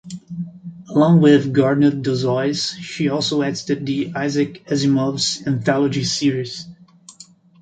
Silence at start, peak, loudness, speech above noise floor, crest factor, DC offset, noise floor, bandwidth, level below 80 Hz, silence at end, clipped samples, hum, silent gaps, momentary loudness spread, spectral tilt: 0.05 s; -2 dBFS; -18 LUFS; 29 dB; 16 dB; under 0.1%; -46 dBFS; 9.2 kHz; -58 dBFS; 0.4 s; under 0.1%; none; none; 17 LU; -5.5 dB/octave